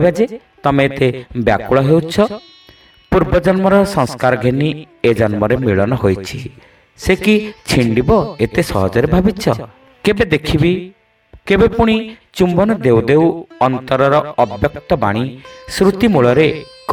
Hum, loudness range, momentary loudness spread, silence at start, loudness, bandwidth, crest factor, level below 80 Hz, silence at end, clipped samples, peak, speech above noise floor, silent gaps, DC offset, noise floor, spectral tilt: none; 2 LU; 8 LU; 0 s; -14 LUFS; 16.5 kHz; 14 dB; -34 dBFS; 0 s; under 0.1%; 0 dBFS; 32 dB; none; under 0.1%; -46 dBFS; -6.5 dB/octave